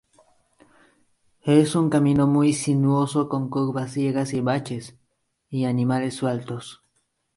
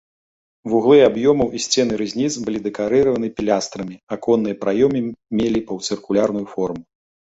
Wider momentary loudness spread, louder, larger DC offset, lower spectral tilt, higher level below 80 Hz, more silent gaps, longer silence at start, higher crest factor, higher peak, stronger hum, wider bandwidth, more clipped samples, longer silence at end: about the same, 14 LU vs 12 LU; second, -22 LUFS vs -19 LUFS; neither; first, -6.5 dB/octave vs -5 dB/octave; second, -60 dBFS vs -52 dBFS; second, none vs 4.03-4.07 s; first, 1.45 s vs 0.65 s; about the same, 18 dB vs 18 dB; about the same, -4 dBFS vs -2 dBFS; neither; first, 11.5 kHz vs 8 kHz; neither; about the same, 0.6 s vs 0.55 s